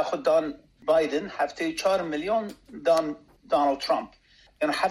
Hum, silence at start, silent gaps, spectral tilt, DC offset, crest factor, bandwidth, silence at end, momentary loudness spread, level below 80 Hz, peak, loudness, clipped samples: none; 0 s; none; -4 dB/octave; under 0.1%; 16 dB; 13.5 kHz; 0 s; 11 LU; -62 dBFS; -10 dBFS; -26 LUFS; under 0.1%